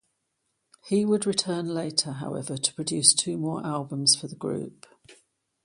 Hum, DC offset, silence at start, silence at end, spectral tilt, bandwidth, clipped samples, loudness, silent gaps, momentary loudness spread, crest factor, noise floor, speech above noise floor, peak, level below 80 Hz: none; under 0.1%; 0.85 s; 0.5 s; -3 dB/octave; 11.5 kHz; under 0.1%; -25 LUFS; none; 13 LU; 26 dB; -77 dBFS; 51 dB; -2 dBFS; -70 dBFS